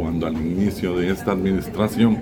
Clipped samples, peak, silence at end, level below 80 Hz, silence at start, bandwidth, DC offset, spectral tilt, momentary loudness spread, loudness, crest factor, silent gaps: under 0.1%; -6 dBFS; 0 s; -42 dBFS; 0 s; 17.5 kHz; under 0.1%; -7 dB/octave; 5 LU; -22 LUFS; 16 dB; none